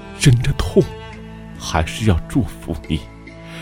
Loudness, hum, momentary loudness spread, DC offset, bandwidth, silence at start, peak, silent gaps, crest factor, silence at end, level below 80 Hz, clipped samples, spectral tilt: -19 LUFS; none; 20 LU; under 0.1%; 16.5 kHz; 0 s; 0 dBFS; none; 20 dB; 0 s; -30 dBFS; under 0.1%; -6 dB/octave